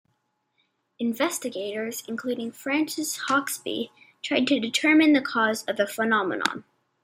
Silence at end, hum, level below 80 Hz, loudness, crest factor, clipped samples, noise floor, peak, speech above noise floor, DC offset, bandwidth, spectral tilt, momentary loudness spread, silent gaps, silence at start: 0.45 s; none; -74 dBFS; -25 LUFS; 24 dB; under 0.1%; -74 dBFS; -2 dBFS; 49 dB; under 0.1%; 16 kHz; -2.5 dB/octave; 12 LU; none; 1 s